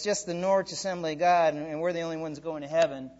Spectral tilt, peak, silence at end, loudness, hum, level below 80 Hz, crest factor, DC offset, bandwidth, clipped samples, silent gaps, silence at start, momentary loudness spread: -4 dB/octave; -12 dBFS; 0.05 s; -28 LUFS; none; -66 dBFS; 16 dB; under 0.1%; 8 kHz; under 0.1%; none; 0 s; 11 LU